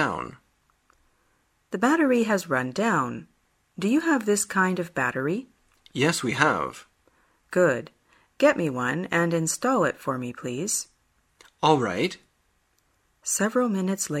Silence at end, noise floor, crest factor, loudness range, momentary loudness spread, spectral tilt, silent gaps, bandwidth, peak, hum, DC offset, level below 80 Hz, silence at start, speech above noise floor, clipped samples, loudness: 0 s; -69 dBFS; 22 dB; 3 LU; 12 LU; -4.5 dB/octave; none; 16 kHz; -4 dBFS; none; under 0.1%; -64 dBFS; 0 s; 44 dB; under 0.1%; -25 LUFS